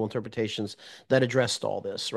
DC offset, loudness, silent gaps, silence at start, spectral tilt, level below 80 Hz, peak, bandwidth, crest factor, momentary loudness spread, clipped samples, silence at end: under 0.1%; -28 LUFS; none; 0 s; -4.5 dB/octave; -70 dBFS; -8 dBFS; 12.5 kHz; 20 dB; 11 LU; under 0.1%; 0 s